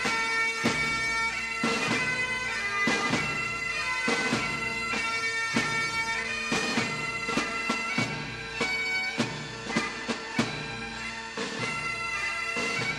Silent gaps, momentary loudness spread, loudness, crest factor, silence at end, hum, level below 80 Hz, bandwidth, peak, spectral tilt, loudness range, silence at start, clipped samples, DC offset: none; 6 LU; -28 LUFS; 18 dB; 0 s; none; -54 dBFS; 15 kHz; -12 dBFS; -3 dB/octave; 4 LU; 0 s; under 0.1%; under 0.1%